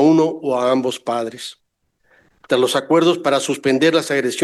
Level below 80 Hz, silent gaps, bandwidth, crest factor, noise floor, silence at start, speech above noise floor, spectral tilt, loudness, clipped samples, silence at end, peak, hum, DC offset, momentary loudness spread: -66 dBFS; none; 12.5 kHz; 14 dB; -62 dBFS; 0 s; 44 dB; -4.5 dB/octave; -17 LUFS; under 0.1%; 0 s; -4 dBFS; none; under 0.1%; 9 LU